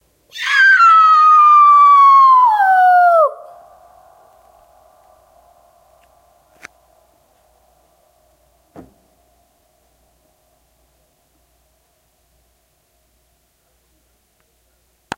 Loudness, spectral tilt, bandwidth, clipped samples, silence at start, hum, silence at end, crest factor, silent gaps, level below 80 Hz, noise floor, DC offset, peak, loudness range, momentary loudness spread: -9 LUFS; -1 dB/octave; 15.5 kHz; under 0.1%; 0.35 s; none; 11.85 s; 14 dB; none; -64 dBFS; -61 dBFS; under 0.1%; -2 dBFS; 10 LU; 9 LU